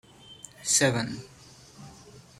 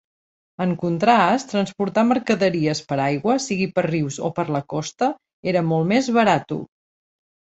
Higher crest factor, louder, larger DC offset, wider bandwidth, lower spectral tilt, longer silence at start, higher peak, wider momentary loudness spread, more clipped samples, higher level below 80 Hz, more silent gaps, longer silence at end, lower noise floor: about the same, 22 dB vs 18 dB; second, -25 LUFS vs -21 LUFS; neither; first, 16 kHz vs 8.2 kHz; second, -2.5 dB/octave vs -5.5 dB/octave; second, 0.3 s vs 0.6 s; second, -10 dBFS vs -2 dBFS; first, 26 LU vs 8 LU; neither; about the same, -62 dBFS vs -60 dBFS; second, none vs 5.33-5.43 s; second, 0.2 s vs 0.95 s; second, -51 dBFS vs under -90 dBFS